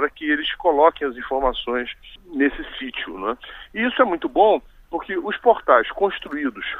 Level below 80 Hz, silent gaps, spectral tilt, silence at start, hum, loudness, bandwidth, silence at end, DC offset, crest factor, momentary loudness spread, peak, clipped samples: -44 dBFS; none; -6 dB/octave; 0 s; none; -21 LUFS; 4.1 kHz; 0 s; under 0.1%; 20 dB; 14 LU; -2 dBFS; under 0.1%